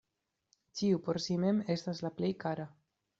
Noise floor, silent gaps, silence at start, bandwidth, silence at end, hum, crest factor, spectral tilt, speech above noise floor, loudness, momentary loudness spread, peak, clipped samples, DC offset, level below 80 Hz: -85 dBFS; none; 0.75 s; 7.8 kHz; 0.5 s; none; 16 dB; -6.5 dB/octave; 52 dB; -34 LUFS; 10 LU; -18 dBFS; under 0.1%; under 0.1%; -72 dBFS